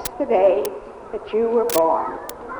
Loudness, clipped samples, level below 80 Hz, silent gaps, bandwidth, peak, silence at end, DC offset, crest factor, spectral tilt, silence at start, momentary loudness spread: -20 LUFS; under 0.1%; -52 dBFS; none; over 20 kHz; -4 dBFS; 0 s; under 0.1%; 16 dB; -4 dB/octave; 0 s; 16 LU